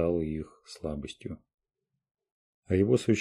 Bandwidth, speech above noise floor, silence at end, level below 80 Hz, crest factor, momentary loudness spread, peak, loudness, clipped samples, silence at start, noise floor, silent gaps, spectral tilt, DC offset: 12 kHz; 56 dB; 0 s; -52 dBFS; 20 dB; 18 LU; -10 dBFS; -30 LUFS; under 0.1%; 0 s; -86 dBFS; 1.54-1.58 s, 2.11-2.15 s, 2.32-2.63 s; -7 dB/octave; under 0.1%